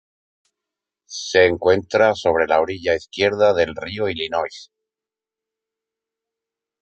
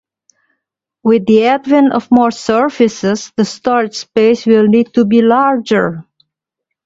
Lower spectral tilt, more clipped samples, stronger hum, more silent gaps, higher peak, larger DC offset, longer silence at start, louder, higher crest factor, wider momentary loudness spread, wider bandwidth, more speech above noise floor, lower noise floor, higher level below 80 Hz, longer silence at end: second, -4 dB/octave vs -6 dB/octave; neither; neither; neither; about the same, -2 dBFS vs 0 dBFS; neither; about the same, 1.1 s vs 1.05 s; second, -19 LUFS vs -12 LUFS; first, 20 dB vs 12 dB; about the same, 9 LU vs 7 LU; first, 8.6 kHz vs 7.8 kHz; about the same, 70 dB vs 67 dB; first, -89 dBFS vs -78 dBFS; first, -48 dBFS vs -54 dBFS; first, 2.2 s vs 0.85 s